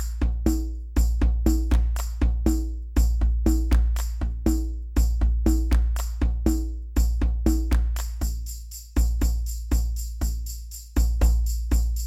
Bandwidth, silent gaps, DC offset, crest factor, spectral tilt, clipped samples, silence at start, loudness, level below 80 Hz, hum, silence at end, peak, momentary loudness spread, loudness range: 14.5 kHz; none; under 0.1%; 16 dB; -6.5 dB/octave; under 0.1%; 0 s; -26 LUFS; -22 dBFS; none; 0 s; -6 dBFS; 7 LU; 3 LU